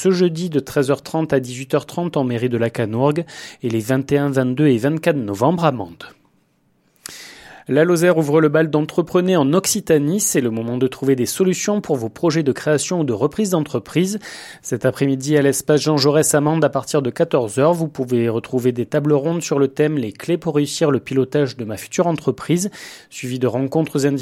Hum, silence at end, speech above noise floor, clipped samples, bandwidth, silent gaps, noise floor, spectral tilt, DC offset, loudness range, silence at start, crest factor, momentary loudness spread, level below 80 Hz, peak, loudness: none; 0 s; 43 dB; under 0.1%; 16.5 kHz; none; -61 dBFS; -5.5 dB/octave; under 0.1%; 4 LU; 0 s; 18 dB; 8 LU; -58 dBFS; 0 dBFS; -18 LUFS